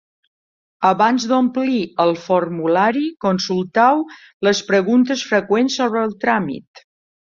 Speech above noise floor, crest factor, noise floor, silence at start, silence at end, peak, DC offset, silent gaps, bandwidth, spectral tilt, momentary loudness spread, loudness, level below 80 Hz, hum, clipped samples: over 73 dB; 16 dB; under -90 dBFS; 0.8 s; 0.75 s; -2 dBFS; under 0.1%; 4.34-4.40 s; 7.4 kHz; -5 dB/octave; 6 LU; -17 LUFS; -62 dBFS; none; under 0.1%